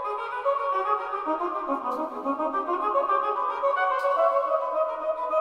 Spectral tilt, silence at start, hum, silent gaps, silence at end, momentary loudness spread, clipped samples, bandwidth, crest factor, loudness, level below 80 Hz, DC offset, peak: -4.5 dB/octave; 0 s; none; none; 0 s; 6 LU; under 0.1%; 11 kHz; 14 dB; -26 LUFS; -66 dBFS; under 0.1%; -12 dBFS